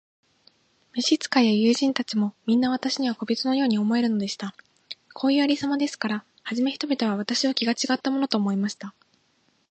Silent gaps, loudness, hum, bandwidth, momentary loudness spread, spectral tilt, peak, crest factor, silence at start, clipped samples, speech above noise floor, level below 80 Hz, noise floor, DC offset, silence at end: none; -24 LUFS; none; 8.8 kHz; 11 LU; -4.5 dB/octave; -4 dBFS; 20 dB; 0.95 s; under 0.1%; 43 dB; -74 dBFS; -67 dBFS; under 0.1%; 0.8 s